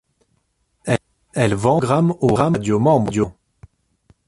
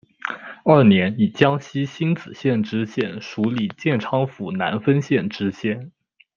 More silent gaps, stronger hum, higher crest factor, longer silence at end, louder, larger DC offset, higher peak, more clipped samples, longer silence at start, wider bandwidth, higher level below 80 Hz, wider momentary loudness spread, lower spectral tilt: neither; neither; about the same, 20 dB vs 20 dB; first, 0.95 s vs 0.5 s; first, -18 LUFS vs -21 LUFS; neither; about the same, 0 dBFS vs 0 dBFS; neither; first, 0.85 s vs 0.25 s; first, 11.5 kHz vs 7 kHz; first, -46 dBFS vs -62 dBFS; second, 8 LU vs 11 LU; about the same, -7 dB/octave vs -7.5 dB/octave